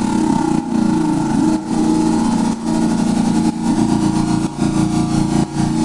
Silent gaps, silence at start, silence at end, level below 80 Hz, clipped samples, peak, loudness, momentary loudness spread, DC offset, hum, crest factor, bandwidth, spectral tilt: none; 0 s; 0 s; -36 dBFS; under 0.1%; -2 dBFS; -16 LUFS; 2 LU; under 0.1%; none; 14 dB; 11.5 kHz; -6.5 dB/octave